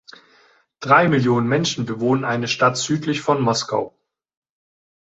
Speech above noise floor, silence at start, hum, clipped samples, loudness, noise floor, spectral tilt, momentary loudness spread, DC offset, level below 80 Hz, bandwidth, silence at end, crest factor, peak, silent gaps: 37 dB; 0.8 s; none; under 0.1%; -19 LUFS; -56 dBFS; -5 dB/octave; 9 LU; under 0.1%; -60 dBFS; 8.2 kHz; 1.15 s; 18 dB; -2 dBFS; none